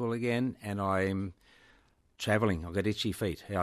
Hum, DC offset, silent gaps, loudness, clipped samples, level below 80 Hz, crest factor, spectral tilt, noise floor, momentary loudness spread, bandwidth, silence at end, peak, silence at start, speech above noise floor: none; under 0.1%; none; -32 LUFS; under 0.1%; -60 dBFS; 20 dB; -6 dB/octave; -65 dBFS; 7 LU; 13.5 kHz; 0 s; -14 dBFS; 0 s; 34 dB